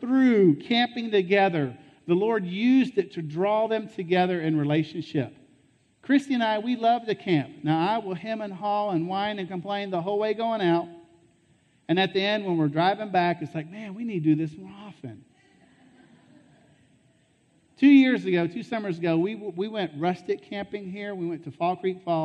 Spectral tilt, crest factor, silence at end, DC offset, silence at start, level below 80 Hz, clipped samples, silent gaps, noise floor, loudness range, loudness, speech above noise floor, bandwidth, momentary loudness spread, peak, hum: -7.5 dB/octave; 18 dB; 0 s; under 0.1%; 0 s; -74 dBFS; under 0.1%; none; -64 dBFS; 6 LU; -25 LUFS; 39 dB; 8.6 kHz; 13 LU; -8 dBFS; none